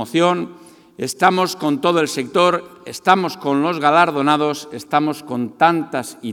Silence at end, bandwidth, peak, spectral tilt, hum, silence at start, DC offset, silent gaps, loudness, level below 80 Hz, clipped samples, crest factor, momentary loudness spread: 0 s; 18 kHz; 0 dBFS; -4.5 dB/octave; none; 0 s; under 0.1%; none; -18 LUFS; -66 dBFS; under 0.1%; 18 dB; 11 LU